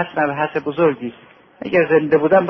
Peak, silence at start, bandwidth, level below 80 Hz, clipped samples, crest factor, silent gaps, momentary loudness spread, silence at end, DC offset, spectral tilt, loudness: -2 dBFS; 0 s; 5.8 kHz; -58 dBFS; under 0.1%; 16 dB; none; 14 LU; 0 s; under 0.1%; -9 dB/octave; -17 LUFS